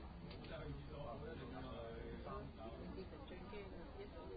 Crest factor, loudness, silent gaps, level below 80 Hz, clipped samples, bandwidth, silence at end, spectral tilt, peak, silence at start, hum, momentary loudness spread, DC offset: 14 dB; -52 LUFS; none; -58 dBFS; under 0.1%; 4.8 kHz; 0 s; -5.5 dB/octave; -38 dBFS; 0 s; none; 4 LU; under 0.1%